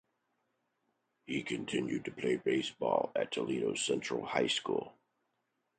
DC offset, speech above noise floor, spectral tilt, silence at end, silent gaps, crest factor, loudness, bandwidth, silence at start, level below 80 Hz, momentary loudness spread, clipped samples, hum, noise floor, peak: under 0.1%; 48 dB; -4 dB/octave; 0.85 s; none; 24 dB; -35 LUFS; 9 kHz; 1.3 s; -74 dBFS; 6 LU; under 0.1%; none; -82 dBFS; -14 dBFS